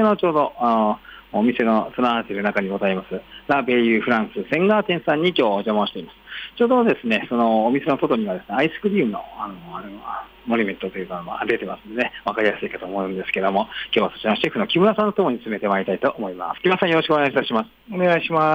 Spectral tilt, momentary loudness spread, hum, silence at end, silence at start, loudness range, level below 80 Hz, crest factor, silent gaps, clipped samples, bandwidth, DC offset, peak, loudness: -7.5 dB/octave; 12 LU; none; 0 s; 0 s; 5 LU; -58 dBFS; 14 dB; none; under 0.1%; 15.5 kHz; under 0.1%; -6 dBFS; -21 LUFS